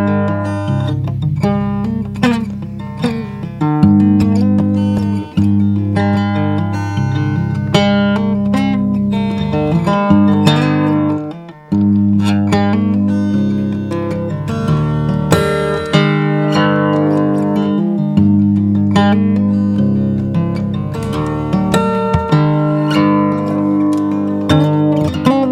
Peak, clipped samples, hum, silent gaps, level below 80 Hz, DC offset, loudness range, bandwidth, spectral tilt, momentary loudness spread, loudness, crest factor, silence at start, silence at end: 0 dBFS; under 0.1%; none; none; -38 dBFS; under 0.1%; 2 LU; 12 kHz; -7.5 dB/octave; 7 LU; -14 LUFS; 14 dB; 0 s; 0 s